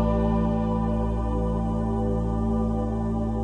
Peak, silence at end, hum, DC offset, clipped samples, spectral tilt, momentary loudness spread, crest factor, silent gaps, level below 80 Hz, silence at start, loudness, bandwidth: -12 dBFS; 0 s; none; under 0.1%; under 0.1%; -10 dB/octave; 3 LU; 12 dB; none; -30 dBFS; 0 s; -26 LUFS; 9.2 kHz